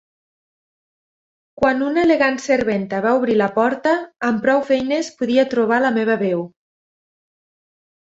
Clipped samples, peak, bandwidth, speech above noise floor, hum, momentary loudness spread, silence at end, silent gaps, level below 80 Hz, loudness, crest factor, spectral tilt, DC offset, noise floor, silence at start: under 0.1%; -2 dBFS; 8 kHz; over 73 dB; none; 5 LU; 1.65 s; none; -56 dBFS; -18 LUFS; 18 dB; -5.5 dB/octave; under 0.1%; under -90 dBFS; 1.6 s